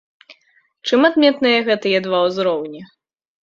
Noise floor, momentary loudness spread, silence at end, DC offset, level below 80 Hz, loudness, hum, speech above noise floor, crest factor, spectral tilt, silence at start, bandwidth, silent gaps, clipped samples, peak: -60 dBFS; 14 LU; 0.6 s; under 0.1%; -64 dBFS; -16 LUFS; none; 43 dB; 18 dB; -5 dB/octave; 0.3 s; 7.6 kHz; none; under 0.1%; -2 dBFS